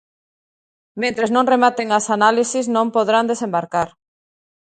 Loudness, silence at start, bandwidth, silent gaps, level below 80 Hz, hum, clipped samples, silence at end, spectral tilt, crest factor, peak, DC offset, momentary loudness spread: -18 LUFS; 0.95 s; 9.4 kHz; none; -64 dBFS; none; under 0.1%; 0.9 s; -3.5 dB/octave; 18 dB; 0 dBFS; under 0.1%; 8 LU